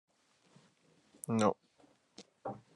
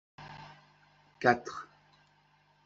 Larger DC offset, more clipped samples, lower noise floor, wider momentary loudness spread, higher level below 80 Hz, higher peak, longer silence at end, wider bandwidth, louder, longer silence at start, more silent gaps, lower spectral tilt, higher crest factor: neither; neither; about the same, -70 dBFS vs -67 dBFS; about the same, 26 LU vs 24 LU; second, -82 dBFS vs -72 dBFS; second, -16 dBFS vs -8 dBFS; second, 0.2 s vs 1 s; first, 11.5 kHz vs 7.8 kHz; second, -36 LUFS vs -30 LUFS; first, 1.3 s vs 0.2 s; neither; first, -6 dB/octave vs -3.5 dB/octave; about the same, 24 dB vs 28 dB